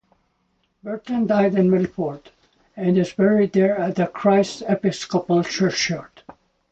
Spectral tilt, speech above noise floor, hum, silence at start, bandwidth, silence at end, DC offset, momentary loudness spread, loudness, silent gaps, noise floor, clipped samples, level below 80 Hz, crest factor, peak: -6 dB/octave; 48 dB; none; 0.85 s; 8.2 kHz; 0.65 s; under 0.1%; 11 LU; -20 LUFS; none; -68 dBFS; under 0.1%; -58 dBFS; 16 dB; -6 dBFS